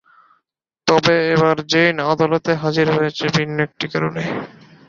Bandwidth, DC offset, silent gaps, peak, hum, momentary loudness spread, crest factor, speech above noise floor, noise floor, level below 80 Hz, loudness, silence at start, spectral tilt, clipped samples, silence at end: 7.6 kHz; under 0.1%; none; -2 dBFS; none; 9 LU; 18 dB; 56 dB; -73 dBFS; -54 dBFS; -17 LUFS; 0.85 s; -5.5 dB/octave; under 0.1%; 0.4 s